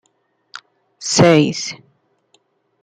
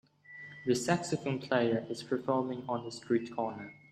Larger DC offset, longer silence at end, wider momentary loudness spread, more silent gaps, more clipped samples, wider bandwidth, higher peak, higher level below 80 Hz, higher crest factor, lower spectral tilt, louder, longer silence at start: neither; first, 1.1 s vs 0.15 s; first, 27 LU vs 13 LU; neither; neither; second, 10.5 kHz vs 15 kHz; first, -2 dBFS vs -12 dBFS; first, -56 dBFS vs -74 dBFS; about the same, 18 dB vs 22 dB; about the same, -4.5 dB/octave vs -5.5 dB/octave; first, -15 LUFS vs -33 LUFS; first, 0.55 s vs 0.3 s